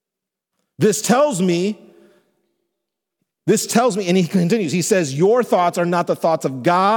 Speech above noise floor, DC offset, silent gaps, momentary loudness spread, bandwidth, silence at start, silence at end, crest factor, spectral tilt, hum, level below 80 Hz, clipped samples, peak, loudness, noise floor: 68 dB; under 0.1%; none; 4 LU; 19 kHz; 0.8 s; 0 s; 16 dB; -5 dB/octave; none; -68 dBFS; under 0.1%; -2 dBFS; -18 LUFS; -84 dBFS